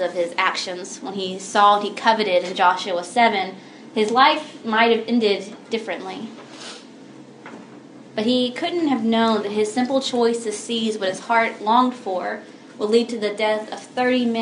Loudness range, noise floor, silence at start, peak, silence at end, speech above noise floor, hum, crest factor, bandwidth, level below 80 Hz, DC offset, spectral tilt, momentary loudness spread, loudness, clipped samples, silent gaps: 7 LU; -42 dBFS; 0 s; 0 dBFS; 0 s; 22 dB; none; 20 dB; 11 kHz; -78 dBFS; under 0.1%; -3.5 dB/octave; 16 LU; -20 LUFS; under 0.1%; none